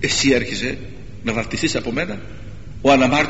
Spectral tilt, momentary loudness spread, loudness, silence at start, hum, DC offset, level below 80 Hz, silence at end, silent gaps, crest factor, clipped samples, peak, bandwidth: -4 dB/octave; 22 LU; -19 LUFS; 0 s; none; 2%; -40 dBFS; 0 s; none; 18 dB; under 0.1%; -2 dBFS; 8.2 kHz